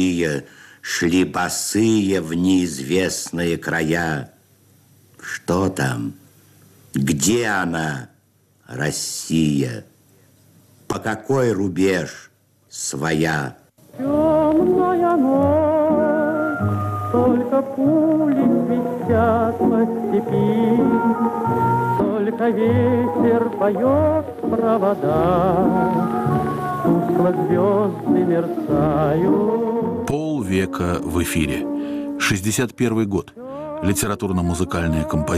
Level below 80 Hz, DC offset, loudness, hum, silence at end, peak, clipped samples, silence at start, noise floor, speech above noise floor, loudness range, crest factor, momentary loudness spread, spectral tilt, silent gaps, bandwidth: -44 dBFS; under 0.1%; -19 LUFS; none; 0 s; -8 dBFS; under 0.1%; 0 s; -58 dBFS; 40 dB; 5 LU; 12 dB; 8 LU; -5.5 dB/octave; none; 15 kHz